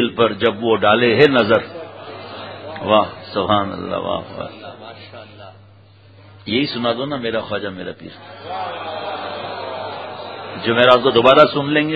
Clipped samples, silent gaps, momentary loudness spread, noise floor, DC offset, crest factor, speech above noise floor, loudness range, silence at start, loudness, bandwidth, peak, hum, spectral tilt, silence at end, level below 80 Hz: under 0.1%; none; 22 LU; -46 dBFS; 0.1%; 18 dB; 30 dB; 10 LU; 0 s; -17 LUFS; 8 kHz; 0 dBFS; none; -7 dB/octave; 0 s; -52 dBFS